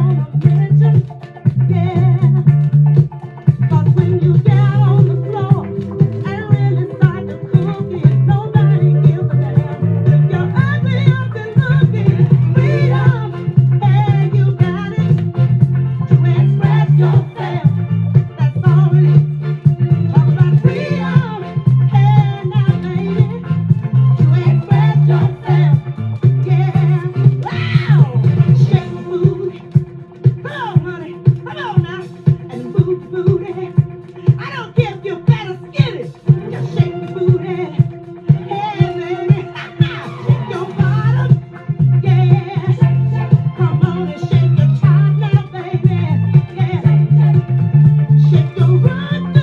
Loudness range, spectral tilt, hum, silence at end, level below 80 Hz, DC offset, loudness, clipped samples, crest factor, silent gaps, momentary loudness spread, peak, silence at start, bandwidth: 5 LU; -10 dB/octave; none; 0 s; -46 dBFS; under 0.1%; -14 LUFS; 0.2%; 12 dB; none; 7 LU; 0 dBFS; 0 s; 4.6 kHz